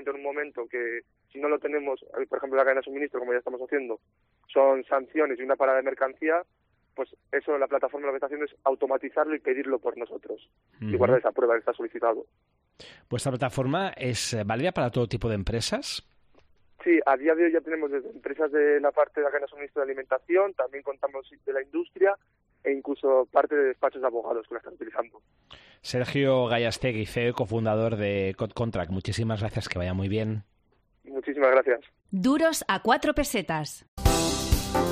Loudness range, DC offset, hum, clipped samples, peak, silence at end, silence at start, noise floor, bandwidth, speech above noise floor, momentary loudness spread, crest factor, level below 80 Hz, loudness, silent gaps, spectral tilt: 4 LU; under 0.1%; none; under 0.1%; -8 dBFS; 0 s; 0 s; -67 dBFS; 13 kHz; 41 dB; 11 LU; 20 dB; -44 dBFS; -27 LUFS; 33.88-33.97 s; -5 dB/octave